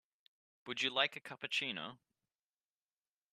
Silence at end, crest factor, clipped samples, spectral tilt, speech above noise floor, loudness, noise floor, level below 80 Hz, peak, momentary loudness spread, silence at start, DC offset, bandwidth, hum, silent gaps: 1.4 s; 26 dB; under 0.1%; -2 dB/octave; over 50 dB; -37 LUFS; under -90 dBFS; -90 dBFS; -16 dBFS; 14 LU; 0.65 s; under 0.1%; 13 kHz; none; none